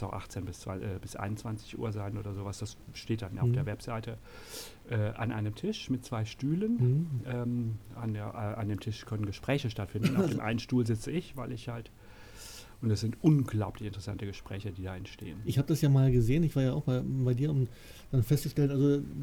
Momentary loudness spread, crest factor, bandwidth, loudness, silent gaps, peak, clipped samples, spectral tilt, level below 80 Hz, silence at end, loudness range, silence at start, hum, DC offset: 15 LU; 20 dB; 18 kHz; -32 LUFS; none; -12 dBFS; under 0.1%; -7 dB/octave; -52 dBFS; 0 s; 7 LU; 0 s; none; under 0.1%